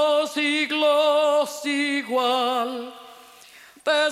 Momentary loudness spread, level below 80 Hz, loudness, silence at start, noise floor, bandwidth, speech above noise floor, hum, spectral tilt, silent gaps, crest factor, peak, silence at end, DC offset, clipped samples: 10 LU; -76 dBFS; -22 LUFS; 0 s; -49 dBFS; 15.5 kHz; 26 dB; none; -1.5 dB/octave; none; 14 dB; -10 dBFS; 0 s; under 0.1%; under 0.1%